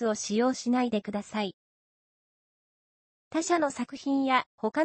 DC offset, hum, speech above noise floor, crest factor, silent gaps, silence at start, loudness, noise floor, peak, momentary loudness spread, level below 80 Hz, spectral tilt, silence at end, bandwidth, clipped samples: under 0.1%; none; over 62 dB; 20 dB; 1.54-3.31 s, 4.46-4.58 s; 0 s; -29 LUFS; under -90 dBFS; -10 dBFS; 8 LU; -74 dBFS; -4 dB/octave; 0 s; 8.8 kHz; under 0.1%